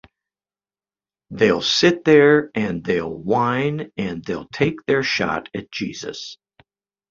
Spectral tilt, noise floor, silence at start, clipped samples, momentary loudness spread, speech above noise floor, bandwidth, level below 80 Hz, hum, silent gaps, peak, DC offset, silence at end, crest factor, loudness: -5 dB/octave; under -90 dBFS; 1.3 s; under 0.1%; 16 LU; over 71 dB; 7.6 kHz; -54 dBFS; none; none; -2 dBFS; under 0.1%; 0.75 s; 18 dB; -19 LUFS